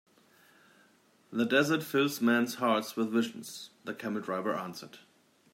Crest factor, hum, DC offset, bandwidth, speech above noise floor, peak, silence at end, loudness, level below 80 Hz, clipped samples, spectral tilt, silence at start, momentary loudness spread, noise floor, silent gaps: 20 dB; none; under 0.1%; 16 kHz; 35 dB; -12 dBFS; 0.55 s; -30 LUFS; -80 dBFS; under 0.1%; -4.5 dB/octave; 1.3 s; 16 LU; -65 dBFS; none